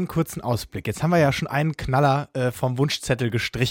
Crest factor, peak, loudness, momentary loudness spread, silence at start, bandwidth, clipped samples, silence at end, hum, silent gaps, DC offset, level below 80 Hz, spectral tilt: 16 dB; -6 dBFS; -23 LUFS; 7 LU; 0 s; 17 kHz; under 0.1%; 0 s; none; none; under 0.1%; -46 dBFS; -5.5 dB/octave